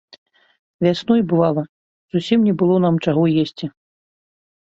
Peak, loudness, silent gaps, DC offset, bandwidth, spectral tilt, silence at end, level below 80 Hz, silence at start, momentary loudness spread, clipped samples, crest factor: -2 dBFS; -18 LUFS; 1.69-2.09 s; under 0.1%; 7.8 kHz; -8 dB/octave; 1 s; -60 dBFS; 0.8 s; 10 LU; under 0.1%; 16 dB